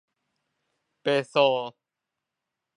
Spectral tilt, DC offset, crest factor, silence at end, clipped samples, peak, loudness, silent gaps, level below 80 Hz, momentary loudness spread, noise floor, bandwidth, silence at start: -5 dB/octave; under 0.1%; 22 dB; 1.05 s; under 0.1%; -6 dBFS; -25 LUFS; none; -84 dBFS; 11 LU; -86 dBFS; 10.5 kHz; 1.05 s